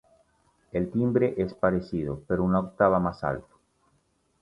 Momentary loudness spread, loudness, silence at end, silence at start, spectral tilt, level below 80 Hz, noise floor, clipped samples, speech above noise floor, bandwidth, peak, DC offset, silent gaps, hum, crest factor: 9 LU; -27 LUFS; 1 s; 0.75 s; -10 dB/octave; -50 dBFS; -69 dBFS; under 0.1%; 44 dB; 5.8 kHz; -6 dBFS; under 0.1%; none; none; 22 dB